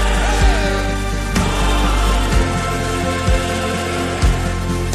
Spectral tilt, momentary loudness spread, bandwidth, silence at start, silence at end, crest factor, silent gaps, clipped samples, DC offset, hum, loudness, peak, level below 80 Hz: -4.5 dB/octave; 4 LU; 14 kHz; 0 s; 0 s; 14 dB; none; under 0.1%; under 0.1%; none; -18 LUFS; -2 dBFS; -20 dBFS